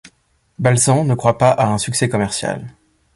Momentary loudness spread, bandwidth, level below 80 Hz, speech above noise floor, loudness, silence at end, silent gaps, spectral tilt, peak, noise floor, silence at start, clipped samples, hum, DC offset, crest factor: 8 LU; 12 kHz; -48 dBFS; 40 dB; -16 LUFS; 0.45 s; none; -5 dB/octave; 0 dBFS; -56 dBFS; 0.6 s; under 0.1%; none; under 0.1%; 18 dB